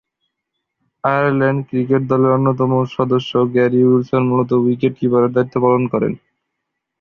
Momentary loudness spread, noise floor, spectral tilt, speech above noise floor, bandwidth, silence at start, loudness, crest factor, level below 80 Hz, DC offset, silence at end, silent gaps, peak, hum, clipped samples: 5 LU; -77 dBFS; -9 dB/octave; 62 dB; 6.4 kHz; 1.05 s; -16 LUFS; 14 dB; -56 dBFS; under 0.1%; 0.85 s; none; -2 dBFS; none; under 0.1%